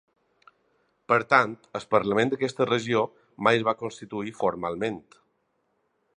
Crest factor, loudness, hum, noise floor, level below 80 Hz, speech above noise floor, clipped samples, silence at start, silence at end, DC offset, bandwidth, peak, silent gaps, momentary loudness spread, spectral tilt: 24 dB; -25 LUFS; none; -73 dBFS; -66 dBFS; 47 dB; under 0.1%; 1.1 s; 1.2 s; under 0.1%; 10 kHz; -4 dBFS; none; 12 LU; -5.5 dB/octave